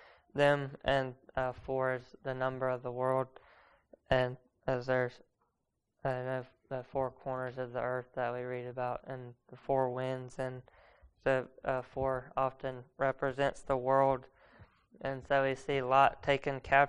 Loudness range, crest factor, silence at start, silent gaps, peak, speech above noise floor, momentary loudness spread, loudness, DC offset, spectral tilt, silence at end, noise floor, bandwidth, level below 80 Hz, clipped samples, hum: 6 LU; 24 dB; 0.35 s; none; -10 dBFS; 50 dB; 12 LU; -34 LUFS; under 0.1%; -6.5 dB/octave; 0 s; -84 dBFS; 10.5 kHz; -58 dBFS; under 0.1%; none